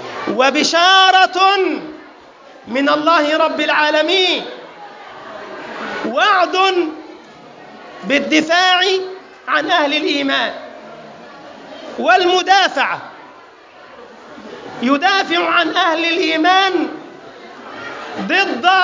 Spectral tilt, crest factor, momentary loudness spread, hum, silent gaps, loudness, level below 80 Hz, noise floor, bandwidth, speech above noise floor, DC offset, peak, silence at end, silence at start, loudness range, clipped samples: -2 dB/octave; 16 dB; 22 LU; none; none; -14 LUFS; -66 dBFS; -41 dBFS; 7.6 kHz; 27 dB; under 0.1%; -2 dBFS; 0 s; 0 s; 4 LU; under 0.1%